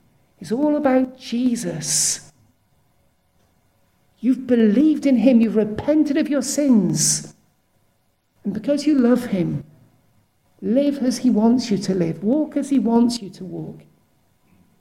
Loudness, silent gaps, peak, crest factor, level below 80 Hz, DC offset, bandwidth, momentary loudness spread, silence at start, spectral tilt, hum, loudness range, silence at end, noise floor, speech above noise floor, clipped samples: -19 LUFS; none; -4 dBFS; 16 dB; -60 dBFS; under 0.1%; 15.5 kHz; 13 LU; 0.4 s; -5 dB/octave; none; 6 LU; 1 s; -65 dBFS; 46 dB; under 0.1%